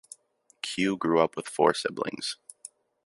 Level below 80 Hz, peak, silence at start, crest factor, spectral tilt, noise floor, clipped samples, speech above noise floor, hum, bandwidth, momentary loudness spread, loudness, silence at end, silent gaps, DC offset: -68 dBFS; -6 dBFS; 0.65 s; 24 dB; -4 dB/octave; -65 dBFS; under 0.1%; 38 dB; none; 11.5 kHz; 19 LU; -28 LUFS; 0.4 s; none; under 0.1%